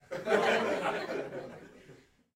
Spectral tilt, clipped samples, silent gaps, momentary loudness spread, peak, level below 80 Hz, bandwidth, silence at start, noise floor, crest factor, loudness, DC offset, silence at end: -4 dB/octave; under 0.1%; none; 19 LU; -12 dBFS; -70 dBFS; 16 kHz; 0.1 s; -59 dBFS; 20 dB; -31 LUFS; under 0.1%; 0.4 s